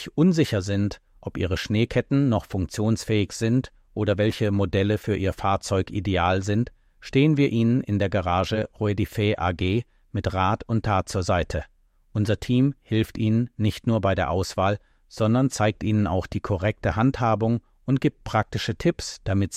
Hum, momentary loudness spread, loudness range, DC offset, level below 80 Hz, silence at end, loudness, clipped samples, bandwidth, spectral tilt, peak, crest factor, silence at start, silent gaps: none; 7 LU; 2 LU; under 0.1%; -44 dBFS; 0 s; -24 LUFS; under 0.1%; 14.5 kHz; -6.5 dB/octave; -8 dBFS; 16 dB; 0 s; none